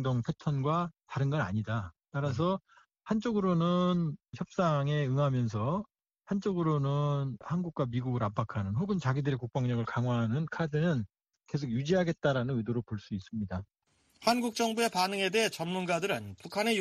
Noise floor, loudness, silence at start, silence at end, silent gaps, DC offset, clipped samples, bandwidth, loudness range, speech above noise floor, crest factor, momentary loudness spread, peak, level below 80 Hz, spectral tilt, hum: -64 dBFS; -32 LUFS; 0 s; 0 s; none; under 0.1%; under 0.1%; 13.5 kHz; 2 LU; 33 dB; 20 dB; 9 LU; -10 dBFS; -62 dBFS; -6.5 dB/octave; none